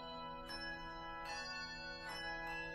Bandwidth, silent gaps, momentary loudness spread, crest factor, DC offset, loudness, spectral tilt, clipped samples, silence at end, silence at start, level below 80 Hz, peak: 15.5 kHz; none; 4 LU; 12 dB; under 0.1%; -46 LUFS; -3 dB/octave; under 0.1%; 0 s; 0 s; -60 dBFS; -34 dBFS